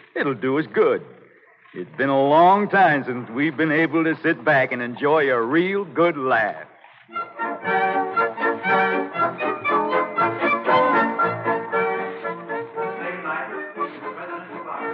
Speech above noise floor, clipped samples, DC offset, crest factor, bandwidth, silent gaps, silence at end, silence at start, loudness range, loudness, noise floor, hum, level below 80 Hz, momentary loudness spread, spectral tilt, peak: 32 dB; under 0.1%; under 0.1%; 16 dB; 5.8 kHz; none; 0 s; 0.15 s; 4 LU; -21 LUFS; -51 dBFS; none; -74 dBFS; 13 LU; -8.5 dB/octave; -6 dBFS